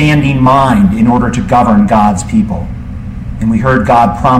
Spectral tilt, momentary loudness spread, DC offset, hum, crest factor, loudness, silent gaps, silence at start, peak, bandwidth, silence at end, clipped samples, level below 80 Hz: -7 dB/octave; 15 LU; under 0.1%; none; 10 dB; -9 LUFS; none; 0 s; 0 dBFS; 12.5 kHz; 0 s; under 0.1%; -24 dBFS